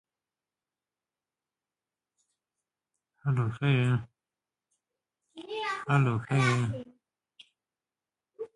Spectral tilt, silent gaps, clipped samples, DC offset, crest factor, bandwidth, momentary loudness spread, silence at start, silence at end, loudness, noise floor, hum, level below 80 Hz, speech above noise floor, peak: -6.5 dB/octave; none; under 0.1%; under 0.1%; 22 dB; 11 kHz; 14 LU; 3.25 s; 0.1 s; -29 LUFS; under -90 dBFS; none; -66 dBFS; over 63 dB; -12 dBFS